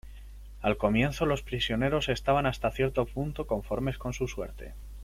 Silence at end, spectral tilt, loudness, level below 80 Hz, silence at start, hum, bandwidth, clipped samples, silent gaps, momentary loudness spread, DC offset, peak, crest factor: 0 s; -6 dB/octave; -29 LUFS; -42 dBFS; 0.05 s; none; 16 kHz; under 0.1%; none; 16 LU; under 0.1%; -10 dBFS; 20 dB